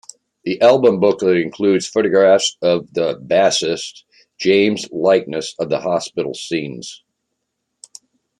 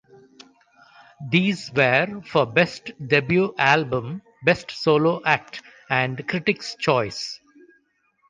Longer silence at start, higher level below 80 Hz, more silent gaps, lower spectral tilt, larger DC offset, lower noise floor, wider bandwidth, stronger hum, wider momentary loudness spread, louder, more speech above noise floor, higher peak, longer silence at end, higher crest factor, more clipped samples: second, 0.45 s vs 1.2 s; about the same, -64 dBFS vs -60 dBFS; neither; second, -4 dB/octave vs -5.5 dB/octave; neither; first, -75 dBFS vs -66 dBFS; first, 11.5 kHz vs 9.6 kHz; neither; about the same, 13 LU vs 14 LU; first, -16 LUFS vs -21 LUFS; first, 59 dB vs 44 dB; about the same, -2 dBFS vs -2 dBFS; first, 1.45 s vs 0.95 s; about the same, 16 dB vs 20 dB; neither